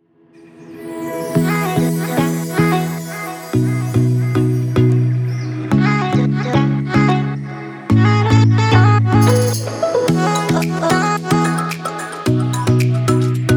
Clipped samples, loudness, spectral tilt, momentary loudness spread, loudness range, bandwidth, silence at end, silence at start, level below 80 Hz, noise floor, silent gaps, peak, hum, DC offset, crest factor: under 0.1%; -16 LUFS; -6.5 dB/octave; 11 LU; 4 LU; 19.5 kHz; 0 s; 0.6 s; -44 dBFS; -46 dBFS; none; 0 dBFS; none; under 0.1%; 16 dB